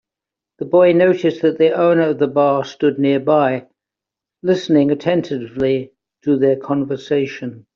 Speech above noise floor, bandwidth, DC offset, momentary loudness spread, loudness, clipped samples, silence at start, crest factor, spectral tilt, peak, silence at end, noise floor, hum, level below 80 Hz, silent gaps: 70 dB; 7.2 kHz; under 0.1%; 10 LU; -16 LUFS; under 0.1%; 0.6 s; 14 dB; -6 dB/octave; -2 dBFS; 0.15 s; -86 dBFS; none; -60 dBFS; none